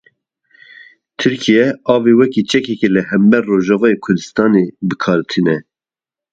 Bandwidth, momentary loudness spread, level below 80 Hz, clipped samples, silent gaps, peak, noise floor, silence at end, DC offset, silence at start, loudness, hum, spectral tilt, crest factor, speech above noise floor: 8 kHz; 6 LU; -56 dBFS; under 0.1%; none; 0 dBFS; -90 dBFS; 0.7 s; under 0.1%; 1.2 s; -14 LUFS; none; -6 dB/octave; 14 dB; 77 dB